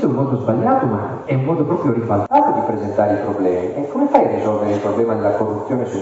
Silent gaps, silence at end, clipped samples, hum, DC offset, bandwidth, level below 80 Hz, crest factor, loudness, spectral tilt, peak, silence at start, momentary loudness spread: none; 0 s; under 0.1%; none; under 0.1%; 8 kHz; -54 dBFS; 16 dB; -18 LUFS; -9 dB/octave; 0 dBFS; 0 s; 6 LU